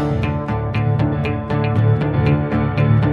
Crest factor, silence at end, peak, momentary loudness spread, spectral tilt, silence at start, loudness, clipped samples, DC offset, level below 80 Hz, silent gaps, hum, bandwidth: 14 dB; 0 s; -4 dBFS; 5 LU; -9.5 dB/octave; 0 s; -18 LUFS; under 0.1%; under 0.1%; -32 dBFS; none; none; 4.9 kHz